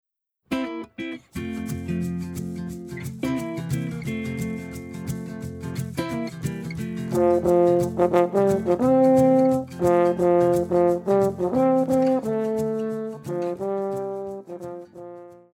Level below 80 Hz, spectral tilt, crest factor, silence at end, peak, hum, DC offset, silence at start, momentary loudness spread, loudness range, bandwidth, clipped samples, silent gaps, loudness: -52 dBFS; -7.5 dB/octave; 18 dB; 0.2 s; -6 dBFS; none; under 0.1%; 0.5 s; 15 LU; 11 LU; 17.5 kHz; under 0.1%; none; -23 LUFS